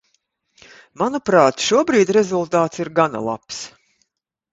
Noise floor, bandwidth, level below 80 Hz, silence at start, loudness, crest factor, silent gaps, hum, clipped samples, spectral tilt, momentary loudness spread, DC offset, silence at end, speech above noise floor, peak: -77 dBFS; 8 kHz; -60 dBFS; 1 s; -18 LUFS; 20 dB; none; none; under 0.1%; -4.5 dB/octave; 14 LU; under 0.1%; 0.85 s; 60 dB; 0 dBFS